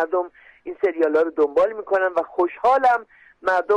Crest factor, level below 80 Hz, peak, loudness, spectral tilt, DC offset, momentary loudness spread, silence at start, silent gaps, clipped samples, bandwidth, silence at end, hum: 12 dB; -62 dBFS; -10 dBFS; -21 LUFS; -5 dB/octave; under 0.1%; 9 LU; 0 s; none; under 0.1%; 9.4 kHz; 0 s; none